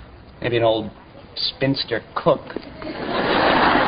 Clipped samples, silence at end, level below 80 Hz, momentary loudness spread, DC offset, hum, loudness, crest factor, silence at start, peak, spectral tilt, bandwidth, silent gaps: under 0.1%; 0 s; -46 dBFS; 16 LU; under 0.1%; none; -21 LUFS; 20 dB; 0 s; -2 dBFS; -10 dB/octave; 5.2 kHz; none